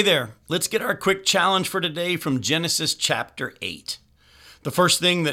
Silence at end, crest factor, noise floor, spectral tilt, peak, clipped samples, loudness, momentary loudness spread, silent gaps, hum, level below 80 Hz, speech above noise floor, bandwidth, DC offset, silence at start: 0 s; 18 dB; -51 dBFS; -3 dB/octave; -4 dBFS; under 0.1%; -22 LUFS; 13 LU; none; none; -60 dBFS; 29 dB; 17 kHz; under 0.1%; 0 s